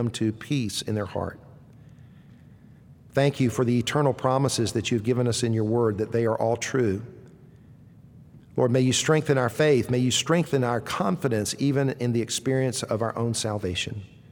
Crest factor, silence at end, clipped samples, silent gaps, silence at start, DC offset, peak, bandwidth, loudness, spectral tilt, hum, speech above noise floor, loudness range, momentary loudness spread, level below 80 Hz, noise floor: 18 dB; 0.25 s; under 0.1%; none; 0 s; under 0.1%; -8 dBFS; 18.5 kHz; -25 LUFS; -5 dB/octave; none; 26 dB; 5 LU; 7 LU; -58 dBFS; -50 dBFS